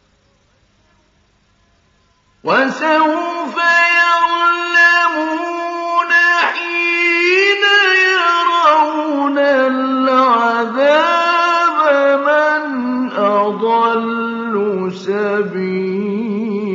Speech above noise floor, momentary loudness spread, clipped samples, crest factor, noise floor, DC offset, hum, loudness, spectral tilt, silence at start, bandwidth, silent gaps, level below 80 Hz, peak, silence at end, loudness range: 42 dB; 9 LU; under 0.1%; 14 dB; -56 dBFS; under 0.1%; none; -13 LUFS; -4 dB/octave; 2.45 s; 7.6 kHz; none; -68 dBFS; 0 dBFS; 0 s; 5 LU